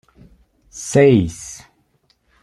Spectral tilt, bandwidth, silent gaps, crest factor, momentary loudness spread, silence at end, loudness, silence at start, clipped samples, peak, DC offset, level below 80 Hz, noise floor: -6 dB/octave; 12.5 kHz; none; 18 dB; 25 LU; 0.9 s; -15 LUFS; 0.75 s; under 0.1%; -2 dBFS; under 0.1%; -48 dBFS; -62 dBFS